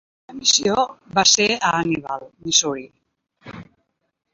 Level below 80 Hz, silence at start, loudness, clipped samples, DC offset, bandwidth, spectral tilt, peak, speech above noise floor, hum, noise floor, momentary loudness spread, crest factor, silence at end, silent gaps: -58 dBFS; 0.3 s; -18 LUFS; under 0.1%; under 0.1%; 8.2 kHz; -1.5 dB/octave; 0 dBFS; 50 dB; none; -70 dBFS; 17 LU; 22 dB; 0.7 s; none